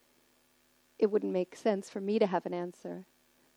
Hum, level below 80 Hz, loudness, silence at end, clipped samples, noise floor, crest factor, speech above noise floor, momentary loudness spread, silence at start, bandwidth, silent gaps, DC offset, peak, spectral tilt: none; -84 dBFS; -32 LUFS; 0.55 s; under 0.1%; -69 dBFS; 20 dB; 37 dB; 14 LU; 1 s; 12.5 kHz; none; under 0.1%; -14 dBFS; -6.5 dB/octave